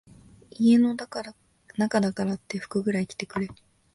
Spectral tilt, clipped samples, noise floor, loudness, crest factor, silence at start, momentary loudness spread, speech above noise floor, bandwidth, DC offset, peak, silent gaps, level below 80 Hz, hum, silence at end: -6.5 dB/octave; under 0.1%; -51 dBFS; -26 LUFS; 16 dB; 0.6 s; 16 LU; 26 dB; 11.5 kHz; under 0.1%; -10 dBFS; none; -62 dBFS; none; 0.4 s